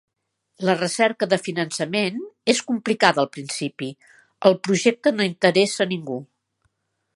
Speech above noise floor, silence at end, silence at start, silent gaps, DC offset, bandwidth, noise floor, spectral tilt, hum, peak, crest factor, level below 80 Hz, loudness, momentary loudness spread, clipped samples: 50 dB; 0.9 s; 0.6 s; none; under 0.1%; 11.5 kHz; -71 dBFS; -4 dB/octave; none; 0 dBFS; 22 dB; -72 dBFS; -21 LUFS; 10 LU; under 0.1%